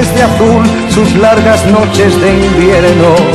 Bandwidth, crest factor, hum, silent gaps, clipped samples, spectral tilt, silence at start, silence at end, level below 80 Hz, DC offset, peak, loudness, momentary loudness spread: 14 kHz; 6 dB; none; none; 0.6%; -5.5 dB/octave; 0 s; 0 s; -22 dBFS; under 0.1%; 0 dBFS; -7 LUFS; 3 LU